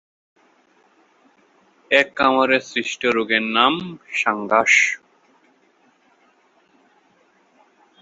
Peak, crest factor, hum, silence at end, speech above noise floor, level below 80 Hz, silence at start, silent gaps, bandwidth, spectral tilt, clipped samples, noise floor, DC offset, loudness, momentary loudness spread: -2 dBFS; 22 dB; none; 3.05 s; 40 dB; -64 dBFS; 1.9 s; none; 8 kHz; -2.5 dB/octave; under 0.1%; -59 dBFS; under 0.1%; -18 LUFS; 9 LU